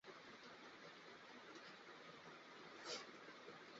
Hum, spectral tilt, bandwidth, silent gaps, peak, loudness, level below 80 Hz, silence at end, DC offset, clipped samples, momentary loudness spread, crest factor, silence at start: none; -1 dB/octave; 7.6 kHz; none; -38 dBFS; -57 LUFS; under -90 dBFS; 0 s; under 0.1%; under 0.1%; 8 LU; 22 dB; 0.05 s